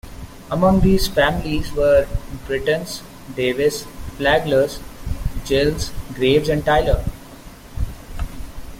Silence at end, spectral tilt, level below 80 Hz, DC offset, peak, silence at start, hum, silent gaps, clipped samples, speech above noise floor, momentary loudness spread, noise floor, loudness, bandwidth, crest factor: 0 s; -5.5 dB/octave; -30 dBFS; under 0.1%; -2 dBFS; 0.05 s; none; none; under 0.1%; 21 dB; 17 LU; -39 dBFS; -19 LUFS; 16.5 kHz; 18 dB